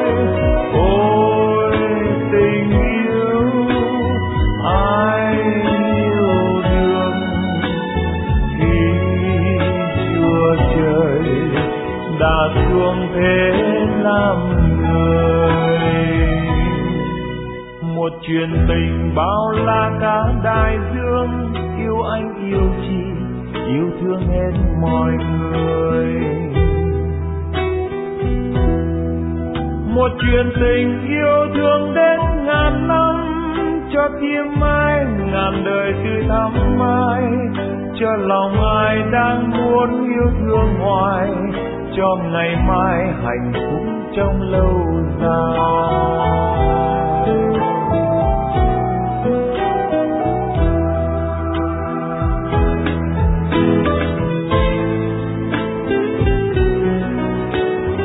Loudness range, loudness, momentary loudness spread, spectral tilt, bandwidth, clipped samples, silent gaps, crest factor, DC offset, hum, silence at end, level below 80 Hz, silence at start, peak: 4 LU; -17 LUFS; 6 LU; -11.5 dB/octave; 4 kHz; under 0.1%; none; 14 dB; under 0.1%; none; 0 s; -26 dBFS; 0 s; -2 dBFS